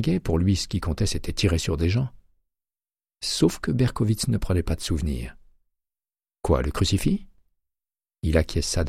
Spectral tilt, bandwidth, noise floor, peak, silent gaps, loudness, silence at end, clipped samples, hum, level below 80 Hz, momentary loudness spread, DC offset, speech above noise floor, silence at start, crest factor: -5.5 dB/octave; 15.5 kHz; under -90 dBFS; -6 dBFS; none; -25 LUFS; 0 s; under 0.1%; none; -34 dBFS; 8 LU; under 0.1%; over 67 dB; 0 s; 18 dB